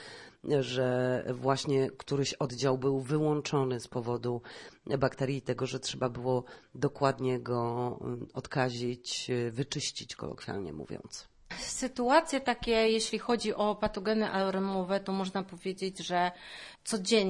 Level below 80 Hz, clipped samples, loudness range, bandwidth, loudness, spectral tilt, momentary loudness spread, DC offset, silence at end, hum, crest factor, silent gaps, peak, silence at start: -60 dBFS; under 0.1%; 5 LU; 11.5 kHz; -32 LUFS; -5 dB/octave; 12 LU; under 0.1%; 0 s; none; 20 dB; none; -12 dBFS; 0 s